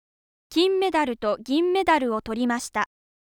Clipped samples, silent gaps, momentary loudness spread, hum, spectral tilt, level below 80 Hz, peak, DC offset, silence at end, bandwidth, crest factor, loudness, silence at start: under 0.1%; none; 7 LU; none; -3.5 dB/octave; -56 dBFS; -8 dBFS; under 0.1%; 0.5 s; 17.5 kHz; 16 dB; -24 LUFS; 0.5 s